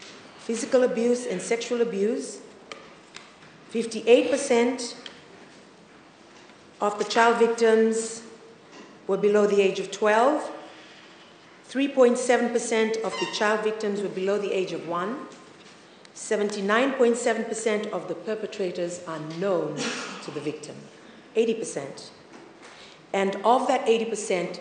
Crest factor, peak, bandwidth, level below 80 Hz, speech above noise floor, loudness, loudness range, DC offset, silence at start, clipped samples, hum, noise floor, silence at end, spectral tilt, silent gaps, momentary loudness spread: 20 dB; -4 dBFS; 9.8 kHz; -78 dBFS; 27 dB; -25 LUFS; 6 LU; under 0.1%; 0 s; under 0.1%; none; -51 dBFS; 0 s; -4 dB/octave; none; 22 LU